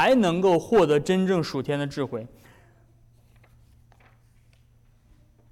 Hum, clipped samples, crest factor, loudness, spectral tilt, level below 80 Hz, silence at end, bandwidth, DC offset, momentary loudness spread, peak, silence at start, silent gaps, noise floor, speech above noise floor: none; under 0.1%; 14 dB; -23 LUFS; -6 dB/octave; -56 dBFS; 3.25 s; 14.5 kHz; under 0.1%; 12 LU; -12 dBFS; 0 s; none; -58 dBFS; 36 dB